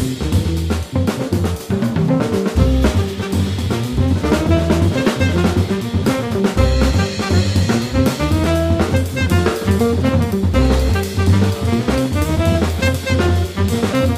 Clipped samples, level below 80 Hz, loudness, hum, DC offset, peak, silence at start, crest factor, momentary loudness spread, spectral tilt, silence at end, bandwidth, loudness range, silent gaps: under 0.1%; -24 dBFS; -17 LUFS; none; under 0.1%; -2 dBFS; 0 s; 14 dB; 4 LU; -6.5 dB/octave; 0 s; 15.5 kHz; 2 LU; none